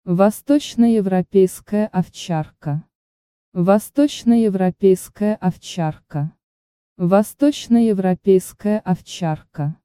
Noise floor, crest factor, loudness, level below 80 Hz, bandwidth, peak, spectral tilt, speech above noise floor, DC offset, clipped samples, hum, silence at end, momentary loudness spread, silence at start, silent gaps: under -90 dBFS; 18 dB; -19 LUFS; -54 dBFS; 15.5 kHz; 0 dBFS; -7 dB/octave; over 72 dB; under 0.1%; under 0.1%; none; 0.1 s; 10 LU; 0.05 s; 2.95-3.52 s, 6.43-6.96 s